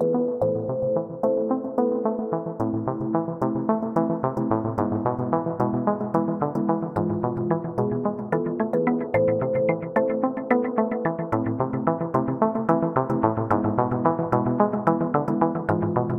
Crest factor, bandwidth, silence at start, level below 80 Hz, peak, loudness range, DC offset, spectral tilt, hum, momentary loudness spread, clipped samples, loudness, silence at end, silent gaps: 20 dB; 5.4 kHz; 0 s; -56 dBFS; -2 dBFS; 2 LU; under 0.1%; -11 dB/octave; none; 4 LU; under 0.1%; -24 LUFS; 0 s; none